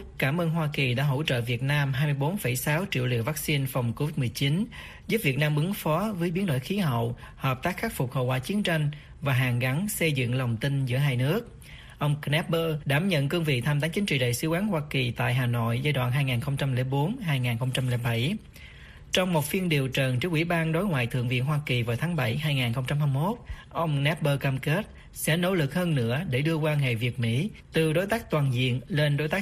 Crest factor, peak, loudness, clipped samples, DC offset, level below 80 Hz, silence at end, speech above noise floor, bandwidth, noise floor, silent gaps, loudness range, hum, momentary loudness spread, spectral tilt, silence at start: 18 dB; -8 dBFS; -27 LUFS; under 0.1%; under 0.1%; -50 dBFS; 0 s; 20 dB; 15.5 kHz; -46 dBFS; none; 2 LU; none; 4 LU; -6 dB/octave; 0 s